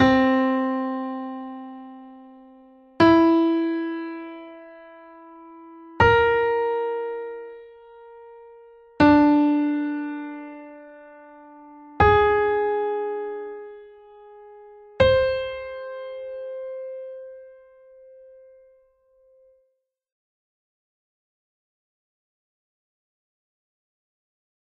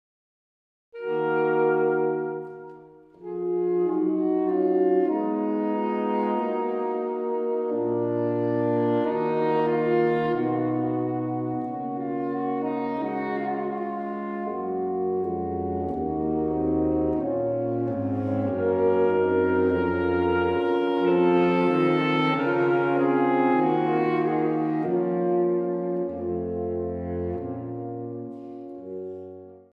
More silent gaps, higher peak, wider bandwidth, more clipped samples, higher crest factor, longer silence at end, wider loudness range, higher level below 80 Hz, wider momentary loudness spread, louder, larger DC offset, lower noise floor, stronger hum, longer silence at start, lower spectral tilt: neither; first, -4 dBFS vs -10 dBFS; first, 6.8 kHz vs 5.2 kHz; neither; first, 22 dB vs 14 dB; first, 7.3 s vs 0.15 s; first, 9 LU vs 6 LU; first, -46 dBFS vs -54 dBFS; first, 25 LU vs 10 LU; first, -21 LUFS vs -25 LUFS; neither; first, -73 dBFS vs -48 dBFS; neither; second, 0 s vs 0.95 s; second, -7.5 dB/octave vs -9.5 dB/octave